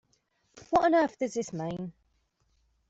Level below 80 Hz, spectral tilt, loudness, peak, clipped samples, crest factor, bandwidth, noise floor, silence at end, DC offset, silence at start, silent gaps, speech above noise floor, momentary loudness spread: -64 dBFS; -5.5 dB/octave; -28 LUFS; -12 dBFS; under 0.1%; 18 dB; 8 kHz; -73 dBFS; 1 s; under 0.1%; 0.55 s; none; 45 dB; 14 LU